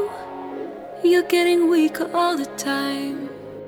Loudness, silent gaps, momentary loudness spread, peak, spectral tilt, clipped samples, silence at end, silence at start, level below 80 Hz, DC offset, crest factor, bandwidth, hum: -20 LUFS; none; 16 LU; -6 dBFS; -3.5 dB/octave; under 0.1%; 0 s; 0 s; -64 dBFS; under 0.1%; 14 dB; 18 kHz; none